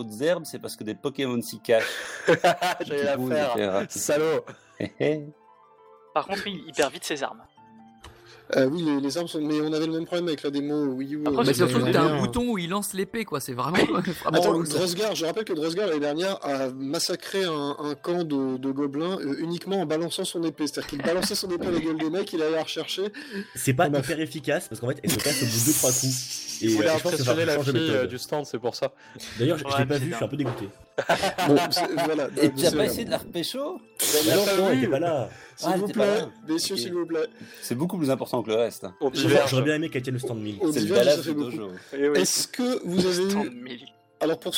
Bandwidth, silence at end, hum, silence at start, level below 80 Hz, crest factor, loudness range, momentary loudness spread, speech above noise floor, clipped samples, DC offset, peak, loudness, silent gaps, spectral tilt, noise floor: 17 kHz; 0 s; none; 0 s; -60 dBFS; 18 dB; 4 LU; 10 LU; 29 dB; under 0.1%; under 0.1%; -8 dBFS; -25 LUFS; none; -4 dB/octave; -54 dBFS